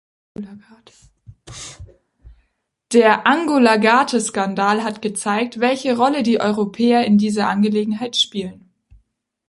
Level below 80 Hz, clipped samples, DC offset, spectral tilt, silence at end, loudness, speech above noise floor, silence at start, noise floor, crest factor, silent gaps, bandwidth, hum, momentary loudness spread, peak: -54 dBFS; under 0.1%; under 0.1%; -4.5 dB/octave; 0.95 s; -17 LUFS; 52 dB; 0.4 s; -70 dBFS; 18 dB; none; 11.5 kHz; none; 20 LU; -2 dBFS